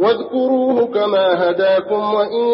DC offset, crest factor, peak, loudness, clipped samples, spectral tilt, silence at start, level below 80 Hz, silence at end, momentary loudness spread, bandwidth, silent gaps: under 0.1%; 12 dB; -4 dBFS; -16 LUFS; under 0.1%; -10 dB/octave; 0 s; -66 dBFS; 0 s; 3 LU; 5.8 kHz; none